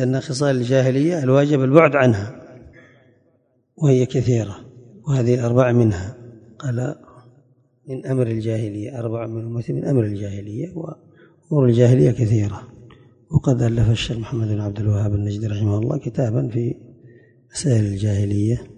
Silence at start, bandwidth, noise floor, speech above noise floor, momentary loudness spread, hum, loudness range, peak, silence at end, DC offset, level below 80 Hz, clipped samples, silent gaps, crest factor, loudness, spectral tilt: 0 s; 10 kHz; -62 dBFS; 44 dB; 15 LU; none; 7 LU; 0 dBFS; 0.05 s; under 0.1%; -42 dBFS; under 0.1%; none; 20 dB; -20 LUFS; -7.5 dB/octave